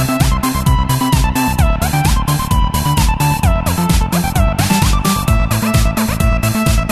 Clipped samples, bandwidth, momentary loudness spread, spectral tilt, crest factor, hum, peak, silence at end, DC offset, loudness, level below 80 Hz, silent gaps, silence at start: under 0.1%; 14 kHz; 2 LU; -5 dB/octave; 12 dB; none; 0 dBFS; 0 s; under 0.1%; -14 LUFS; -18 dBFS; none; 0 s